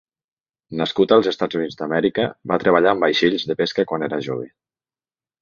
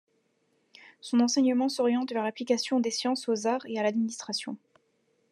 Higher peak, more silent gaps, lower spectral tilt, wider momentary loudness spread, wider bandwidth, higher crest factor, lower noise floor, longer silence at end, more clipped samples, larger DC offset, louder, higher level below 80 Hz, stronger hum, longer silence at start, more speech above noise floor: first, -2 dBFS vs -12 dBFS; neither; first, -6 dB/octave vs -3.5 dB/octave; about the same, 10 LU vs 9 LU; second, 7.2 kHz vs 12 kHz; about the same, 18 dB vs 18 dB; first, under -90 dBFS vs -72 dBFS; first, 0.95 s vs 0.75 s; neither; neither; first, -19 LUFS vs -28 LUFS; first, -60 dBFS vs under -90 dBFS; neither; second, 0.7 s vs 1.05 s; first, over 71 dB vs 44 dB